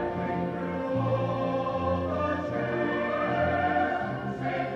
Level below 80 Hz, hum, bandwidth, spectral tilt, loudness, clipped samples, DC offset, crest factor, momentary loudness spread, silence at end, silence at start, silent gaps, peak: -54 dBFS; none; 7.8 kHz; -8 dB/octave; -29 LUFS; under 0.1%; under 0.1%; 14 dB; 5 LU; 0 s; 0 s; none; -14 dBFS